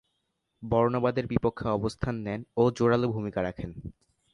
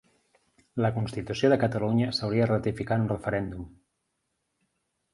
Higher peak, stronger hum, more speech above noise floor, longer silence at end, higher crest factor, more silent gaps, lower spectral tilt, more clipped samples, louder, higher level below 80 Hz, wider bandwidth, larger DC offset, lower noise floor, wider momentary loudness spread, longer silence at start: about the same, -8 dBFS vs -8 dBFS; neither; about the same, 51 dB vs 52 dB; second, 0.4 s vs 1.45 s; about the same, 20 dB vs 20 dB; neither; about the same, -8 dB/octave vs -7 dB/octave; neither; about the same, -28 LUFS vs -27 LUFS; about the same, -50 dBFS vs -54 dBFS; about the same, 11 kHz vs 11.5 kHz; neither; about the same, -78 dBFS vs -79 dBFS; first, 15 LU vs 12 LU; second, 0.6 s vs 0.75 s